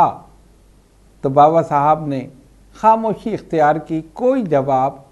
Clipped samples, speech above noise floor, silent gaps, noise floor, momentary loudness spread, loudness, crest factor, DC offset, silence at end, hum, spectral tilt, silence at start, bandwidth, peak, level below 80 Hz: under 0.1%; 34 dB; none; -50 dBFS; 13 LU; -17 LUFS; 18 dB; under 0.1%; 0.15 s; none; -8 dB/octave; 0 s; 11.5 kHz; 0 dBFS; -50 dBFS